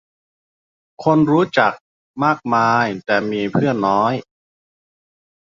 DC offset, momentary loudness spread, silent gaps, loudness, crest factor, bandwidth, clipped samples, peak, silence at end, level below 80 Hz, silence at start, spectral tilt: under 0.1%; 6 LU; 1.81-2.14 s; -17 LUFS; 18 dB; 7.4 kHz; under 0.1%; 0 dBFS; 1.3 s; -58 dBFS; 1 s; -7 dB/octave